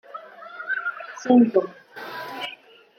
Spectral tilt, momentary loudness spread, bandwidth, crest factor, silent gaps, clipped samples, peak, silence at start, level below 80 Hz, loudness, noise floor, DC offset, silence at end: -5.5 dB/octave; 22 LU; 14.5 kHz; 20 dB; none; under 0.1%; -4 dBFS; 0.15 s; -80 dBFS; -23 LUFS; -46 dBFS; under 0.1%; 0.45 s